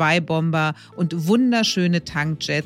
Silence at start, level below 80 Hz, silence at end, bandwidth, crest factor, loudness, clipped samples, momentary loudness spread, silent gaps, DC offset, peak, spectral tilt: 0 s; -56 dBFS; 0 s; 15 kHz; 14 dB; -20 LUFS; under 0.1%; 7 LU; none; under 0.1%; -6 dBFS; -5.5 dB/octave